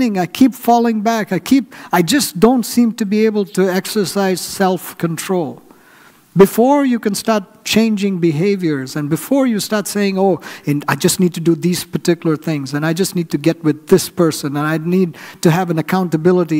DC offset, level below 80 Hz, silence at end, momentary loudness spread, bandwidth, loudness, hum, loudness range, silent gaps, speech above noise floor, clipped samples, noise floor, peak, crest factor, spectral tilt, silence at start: under 0.1%; -52 dBFS; 0 s; 7 LU; 16 kHz; -16 LUFS; none; 2 LU; none; 31 dB; under 0.1%; -46 dBFS; 0 dBFS; 16 dB; -5.5 dB/octave; 0 s